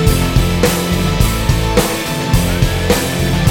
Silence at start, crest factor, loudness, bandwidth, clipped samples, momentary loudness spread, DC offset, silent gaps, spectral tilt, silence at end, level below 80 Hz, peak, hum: 0 s; 14 dB; -15 LUFS; 18 kHz; under 0.1%; 2 LU; under 0.1%; none; -5 dB/octave; 0 s; -20 dBFS; 0 dBFS; none